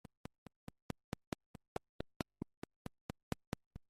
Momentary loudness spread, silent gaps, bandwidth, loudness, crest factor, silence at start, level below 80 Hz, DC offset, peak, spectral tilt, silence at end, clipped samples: 10 LU; 2.16-2.20 s, 2.57-2.62 s, 2.76-2.85 s, 3.01-3.09 s, 3.23-3.32 s, 3.47-3.52 s, 3.66-3.71 s; 14.5 kHz; -51 LUFS; 32 dB; 2 s; -62 dBFS; under 0.1%; -20 dBFS; -6 dB/octave; 0.1 s; under 0.1%